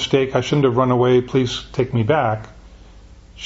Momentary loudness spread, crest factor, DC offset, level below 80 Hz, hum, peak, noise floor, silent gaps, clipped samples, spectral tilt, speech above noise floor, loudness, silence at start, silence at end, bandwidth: 7 LU; 16 dB; under 0.1%; -44 dBFS; none; -2 dBFS; -43 dBFS; none; under 0.1%; -6.5 dB/octave; 26 dB; -18 LUFS; 0 s; 0 s; 8 kHz